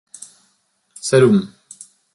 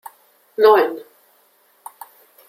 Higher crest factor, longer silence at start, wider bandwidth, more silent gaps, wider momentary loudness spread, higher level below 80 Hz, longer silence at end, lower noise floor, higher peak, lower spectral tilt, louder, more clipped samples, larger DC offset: about the same, 18 dB vs 18 dB; first, 1.05 s vs 0.6 s; second, 11.5 kHz vs 16 kHz; neither; about the same, 26 LU vs 26 LU; first, -60 dBFS vs -74 dBFS; second, 0.65 s vs 1.5 s; first, -64 dBFS vs -58 dBFS; about the same, -2 dBFS vs -2 dBFS; first, -6 dB/octave vs -3.5 dB/octave; about the same, -16 LUFS vs -15 LUFS; neither; neither